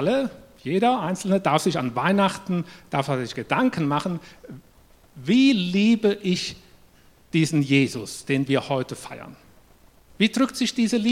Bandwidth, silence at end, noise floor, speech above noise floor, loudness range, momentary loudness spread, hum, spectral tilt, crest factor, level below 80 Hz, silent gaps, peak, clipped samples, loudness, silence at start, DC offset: 15.5 kHz; 0 s; -54 dBFS; 32 dB; 3 LU; 13 LU; none; -5.5 dB/octave; 20 dB; -60 dBFS; none; -4 dBFS; under 0.1%; -23 LUFS; 0 s; under 0.1%